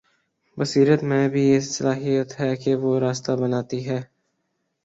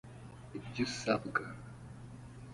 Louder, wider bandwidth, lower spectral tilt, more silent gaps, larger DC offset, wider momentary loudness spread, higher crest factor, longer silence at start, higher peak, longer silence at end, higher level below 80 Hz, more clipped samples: first, -22 LUFS vs -37 LUFS; second, 8 kHz vs 11.5 kHz; about the same, -6 dB/octave vs -5 dB/octave; neither; neither; second, 9 LU vs 18 LU; second, 18 dB vs 26 dB; first, 0.55 s vs 0.05 s; first, -4 dBFS vs -14 dBFS; first, 0.8 s vs 0 s; about the same, -62 dBFS vs -62 dBFS; neither